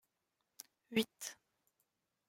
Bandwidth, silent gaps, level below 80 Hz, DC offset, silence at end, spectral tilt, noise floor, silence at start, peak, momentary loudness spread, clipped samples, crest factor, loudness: 16.5 kHz; none; -84 dBFS; under 0.1%; 0.95 s; -3 dB/octave; -86 dBFS; 0.6 s; -22 dBFS; 19 LU; under 0.1%; 24 dB; -40 LUFS